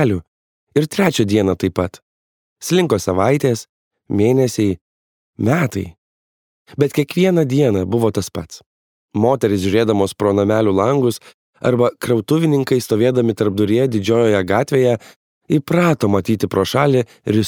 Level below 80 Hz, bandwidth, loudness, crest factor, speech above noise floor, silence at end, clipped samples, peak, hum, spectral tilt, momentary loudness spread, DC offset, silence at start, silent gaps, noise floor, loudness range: -52 dBFS; 19.5 kHz; -17 LUFS; 16 dB; over 74 dB; 0 s; under 0.1%; 0 dBFS; none; -6.5 dB/octave; 9 LU; under 0.1%; 0 s; 0.28-0.67 s, 2.02-2.56 s, 3.69-3.91 s, 4.81-5.33 s, 5.98-6.66 s, 8.66-9.09 s, 11.34-11.53 s, 15.16-15.41 s; under -90 dBFS; 3 LU